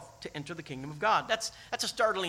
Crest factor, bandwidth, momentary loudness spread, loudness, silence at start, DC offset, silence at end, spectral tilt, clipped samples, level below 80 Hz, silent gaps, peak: 20 dB; 16 kHz; 13 LU; -32 LUFS; 0 s; under 0.1%; 0 s; -2.5 dB/octave; under 0.1%; -64 dBFS; none; -12 dBFS